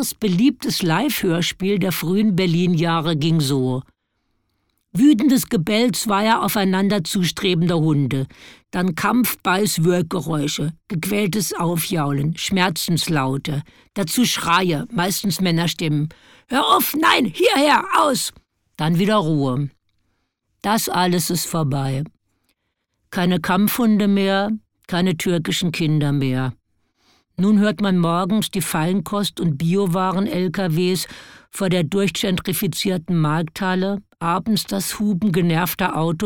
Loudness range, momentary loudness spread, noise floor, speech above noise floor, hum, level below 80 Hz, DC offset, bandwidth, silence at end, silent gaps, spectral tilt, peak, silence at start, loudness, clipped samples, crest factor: 3 LU; 9 LU; -74 dBFS; 55 dB; none; -50 dBFS; 0.3%; 19 kHz; 0 s; none; -5 dB/octave; 0 dBFS; 0 s; -19 LUFS; under 0.1%; 18 dB